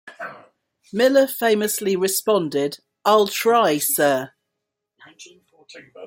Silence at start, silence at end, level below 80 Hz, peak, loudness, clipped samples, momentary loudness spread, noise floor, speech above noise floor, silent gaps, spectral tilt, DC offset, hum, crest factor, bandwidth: 0.05 s; 0 s; -70 dBFS; -4 dBFS; -19 LUFS; under 0.1%; 14 LU; -80 dBFS; 61 dB; none; -3 dB/octave; under 0.1%; none; 18 dB; 17 kHz